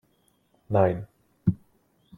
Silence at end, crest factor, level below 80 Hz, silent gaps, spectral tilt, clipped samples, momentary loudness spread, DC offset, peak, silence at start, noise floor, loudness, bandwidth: 0.6 s; 20 dB; -56 dBFS; none; -10.5 dB/octave; under 0.1%; 18 LU; under 0.1%; -8 dBFS; 0.7 s; -67 dBFS; -27 LUFS; 4 kHz